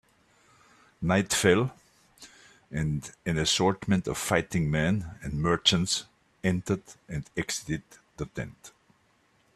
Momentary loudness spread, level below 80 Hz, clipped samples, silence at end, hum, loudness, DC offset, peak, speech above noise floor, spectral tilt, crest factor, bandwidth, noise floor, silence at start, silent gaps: 14 LU; -52 dBFS; under 0.1%; 0.85 s; none; -28 LUFS; under 0.1%; -8 dBFS; 39 dB; -4 dB/octave; 22 dB; 14 kHz; -67 dBFS; 1 s; none